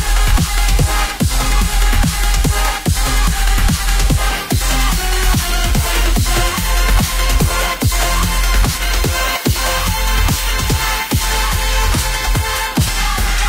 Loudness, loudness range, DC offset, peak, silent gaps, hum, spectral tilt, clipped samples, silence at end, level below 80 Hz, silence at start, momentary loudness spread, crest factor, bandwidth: -16 LUFS; 1 LU; under 0.1%; -2 dBFS; none; none; -3.5 dB/octave; under 0.1%; 0 s; -16 dBFS; 0 s; 2 LU; 12 dB; 16 kHz